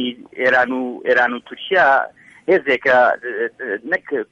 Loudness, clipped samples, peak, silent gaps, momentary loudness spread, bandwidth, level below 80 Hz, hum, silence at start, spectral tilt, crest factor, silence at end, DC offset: -17 LUFS; under 0.1%; -4 dBFS; none; 12 LU; 7.8 kHz; -62 dBFS; none; 0 s; -5 dB/octave; 14 dB; 0.05 s; under 0.1%